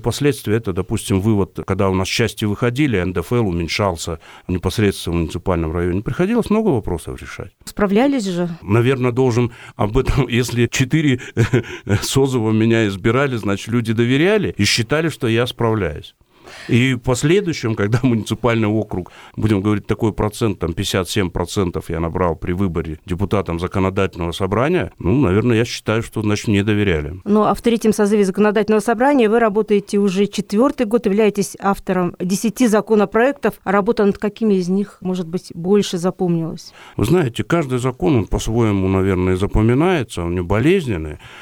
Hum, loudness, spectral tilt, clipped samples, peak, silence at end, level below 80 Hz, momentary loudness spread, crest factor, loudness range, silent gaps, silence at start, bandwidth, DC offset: none; -18 LUFS; -6 dB/octave; under 0.1%; -4 dBFS; 0 s; -36 dBFS; 7 LU; 14 dB; 4 LU; none; 0 s; 18.5 kHz; under 0.1%